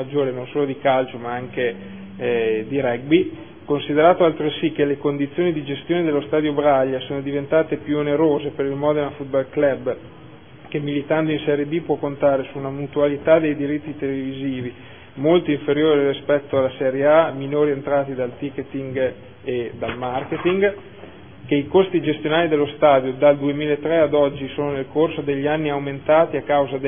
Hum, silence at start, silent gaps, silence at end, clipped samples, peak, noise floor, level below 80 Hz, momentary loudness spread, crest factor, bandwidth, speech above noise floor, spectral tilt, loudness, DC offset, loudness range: none; 0 s; none; 0 s; under 0.1%; -2 dBFS; -42 dBFS; -56 dBFS; 10 LU; 18 dB; 3.6 kHz; 23 dB; -11 dB/octave; -20 LUFS; 0.4%; 4 LU